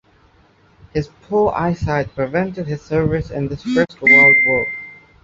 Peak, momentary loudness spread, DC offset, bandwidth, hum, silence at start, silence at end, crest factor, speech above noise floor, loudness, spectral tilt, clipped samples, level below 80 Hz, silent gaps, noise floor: -2 dBFS; 17 LU; under 0.1%; 7.6 kHz; none; 0.95 s; 0.3 s; 16 dB; 36 dB; -15 LUFS; -7 dB/octave; under 0.1%; -40 dBFS; none; -53 dBFS